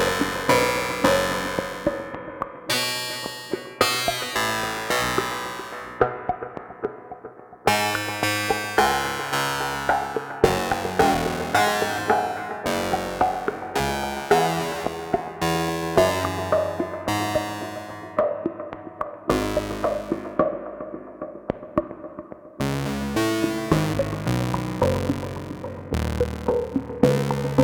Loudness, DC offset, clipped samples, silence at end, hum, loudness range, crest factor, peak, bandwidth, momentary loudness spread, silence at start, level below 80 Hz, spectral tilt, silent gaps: -24 LUFS; under 0.1%; under 0.1%; 0 s; none; 5 LU; 24 dB; -2 dBFS; 19 kHz; 13 LU; 0 s; -44 dBFS; -4.5 dB/octave; none